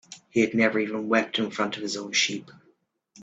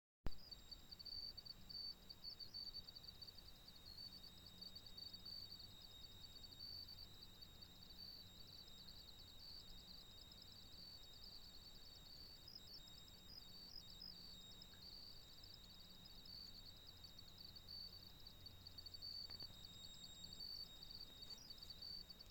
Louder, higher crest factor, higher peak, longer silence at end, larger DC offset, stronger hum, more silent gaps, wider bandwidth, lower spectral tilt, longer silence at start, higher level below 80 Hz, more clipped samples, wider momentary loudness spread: first, -25 LUFS vs -56 LUFS; about the same, 20 dB vs 24 dB; first, -6 dBFS vs -32 dBFS; about the same, 0 s vs 0 s; neither; neither; neither; second, 8.4 kHz vs 17 kHz; about the same, -3 dB/octave vs -2.5 dB/octave; second, 0.1 s vs 0.25 s; about the same, -70 dBFS vs -66 dBFS; neither; about the same, 7 LU vs 8 LU